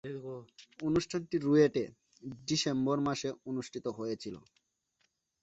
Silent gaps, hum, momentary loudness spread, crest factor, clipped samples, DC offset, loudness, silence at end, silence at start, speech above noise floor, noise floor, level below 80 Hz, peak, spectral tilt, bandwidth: none; none; 18 LU; 20 dB; under 0.1%; under 0.1%; -33 LUFS; 1.05 s; 0.05 s; 45 dB; -78 dBFS; -66 dBFS; -14 dBFS; -5.5 dB/octave; 8.2 kHz